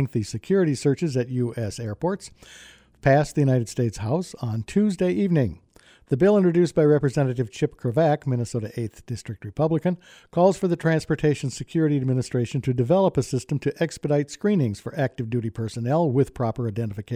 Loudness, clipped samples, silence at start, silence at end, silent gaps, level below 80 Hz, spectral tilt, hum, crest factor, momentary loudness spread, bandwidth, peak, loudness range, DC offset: -24 LUFS; under 0.1%; 0 s; 0 s; none; -52 dBFS; -7.5 dB/octave; none; 16 dB; 10 LU; 13 kHz; -6 dBFS; 3 LU; under 0.1%